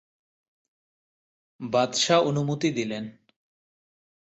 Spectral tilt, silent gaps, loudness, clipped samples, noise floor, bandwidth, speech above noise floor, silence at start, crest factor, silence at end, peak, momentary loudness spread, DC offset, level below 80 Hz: -4.5 dB/octave; none; -24 LUFS; under 0.1%; under -90 dBFS; 8.2 kHz; over 65 dB; 1.6 s; 20 dB; 1.15 s; -8 dBFS; 16 LU; under 0.1%; -68 dBFS